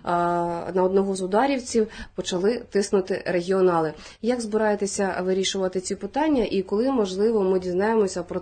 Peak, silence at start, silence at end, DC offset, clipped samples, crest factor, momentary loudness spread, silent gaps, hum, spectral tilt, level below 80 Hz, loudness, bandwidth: -8 dBFS; 0.05 s; 0 s; under 0.1%; under 0.1%; 14 dB; 5 LU; none; none; -5 dB/octave; -52 dBFS; -24 LUFS; 9.4 kHz